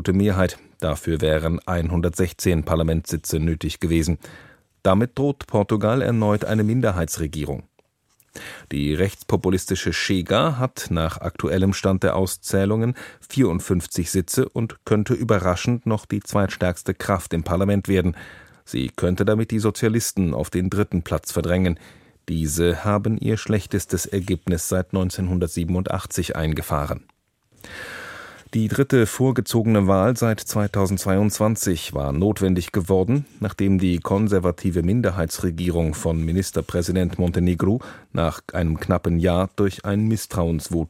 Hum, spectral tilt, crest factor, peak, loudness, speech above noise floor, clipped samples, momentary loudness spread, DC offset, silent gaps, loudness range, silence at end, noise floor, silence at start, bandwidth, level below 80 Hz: none; -6 dB/octave; 20 dB; -2 dBFS; -22 LUFS; 42 dB; under 0.1%; 7 LU; under 0.1%; none; 3 LU; 0 s; -64 dBFS; 0 s; 16.5 kHz; -38 dBFS